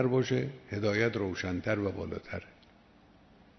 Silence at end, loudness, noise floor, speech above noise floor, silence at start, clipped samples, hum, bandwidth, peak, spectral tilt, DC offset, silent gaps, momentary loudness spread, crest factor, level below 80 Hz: 1.1 s; -33 LUFS; -60 dBFS; 28 dB; 0 s; under 0.1%; none; 6.4 kHz; -14 dBFS; -6.5 dB/octave; under 0.1%; none; 11 LU; 20 dB; -60 dBFS